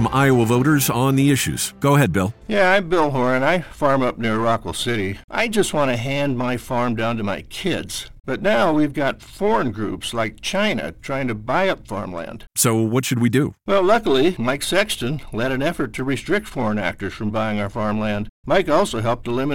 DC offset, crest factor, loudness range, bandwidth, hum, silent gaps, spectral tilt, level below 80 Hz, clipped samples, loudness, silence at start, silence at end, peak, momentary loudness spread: 2%; 18 dB; 4 LU; 17 kHz; none; 5.24-5.28 s, 18.29-18.43 s; -5 dB/octave; -44 dBFS; under 0.1%; -20 LUFS; 0 s; 0 s; -2 dBFS; 9 LU